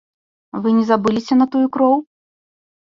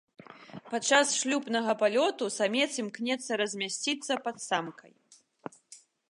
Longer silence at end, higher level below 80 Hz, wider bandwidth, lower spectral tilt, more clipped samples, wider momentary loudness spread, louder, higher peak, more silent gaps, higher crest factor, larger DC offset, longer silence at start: first, 0.85 s vs 0.35 s; first, -60 dBFS vs -84 dBFS; second, 7.4 kHz vs 11.5 kHz; first, -7 dB/octave vs -2 dB/octave; neither; second, 6 LU vs 22 LU; first, -17 LUFS vs -29 LUFS; first, -2 dBFS vs -10 dBFS; neither; second, 16 dB vs 22 dB; neither; first, 0.55 s vs 0.3 s